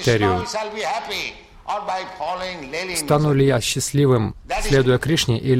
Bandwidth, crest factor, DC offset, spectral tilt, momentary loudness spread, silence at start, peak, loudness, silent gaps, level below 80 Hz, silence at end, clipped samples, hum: 16.5 kHz; 16 dB; under 0.1%; -5 dB/octave; 10 LU; 0 s; -4 dBFS; -21 LUFS; none; -38 dBFS; 0 s; under 0.1%; none